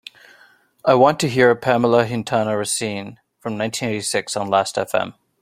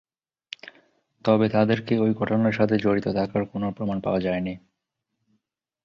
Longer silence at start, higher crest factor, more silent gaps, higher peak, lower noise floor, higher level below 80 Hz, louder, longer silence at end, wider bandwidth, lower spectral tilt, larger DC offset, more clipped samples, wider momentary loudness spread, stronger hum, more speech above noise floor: second, 0.85 s vs 1.25 s; about the same, 18 dB vs 20 dB; neither; first, -2 dBFS vs -6 dBFS; second, -53 dBFS vs -81 dBFS; about the same, -60 dBFS vs -56 dBFS; first, -19 LUFS vs -24 LUFS; second, 0.3 s vs 1.25 s; first, 16 kHz vs 6.6 kHz; second, -4.5 dB/octave vs -8.5 dB/octave; neither; neither; second, 13 LU vs 19 LU; neither; second, 35 dB vs 58 dB